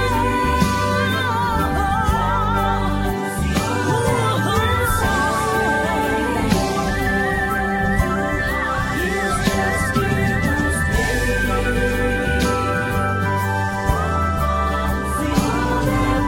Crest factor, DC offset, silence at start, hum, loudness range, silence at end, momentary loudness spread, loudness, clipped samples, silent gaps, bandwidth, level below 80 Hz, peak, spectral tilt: 16 dB; under 0.1%; 0 s; none; 1 LU; 0 s; 2 LU; -19 LUFS; under 0.1%; none; 16.5 kHz; -28 dBFS; -4 dBFS; -5.5 dB/octave